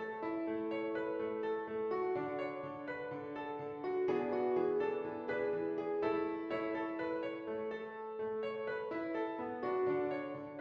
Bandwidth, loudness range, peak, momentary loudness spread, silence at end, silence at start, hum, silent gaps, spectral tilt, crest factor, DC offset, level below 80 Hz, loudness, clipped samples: 6 kHz; 3 LU; -24 dBFS; 8 LU; 0 s; 0 s; none; none; -4.5 dB/octave; 14 dB; under 0.1%; -76 dBFS; -38 LUFS; under 0.1%